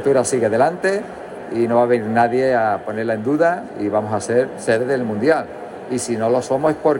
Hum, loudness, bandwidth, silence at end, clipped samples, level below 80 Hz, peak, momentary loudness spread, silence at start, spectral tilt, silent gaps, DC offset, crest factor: none; -19 LUFS; 16.5 kHz; 0 s; under 0.1%; -58 dBFS; -4 dBFS; 8 LU; 0 s; -5.5 dB/octave; none; under 0.1%; 14 dB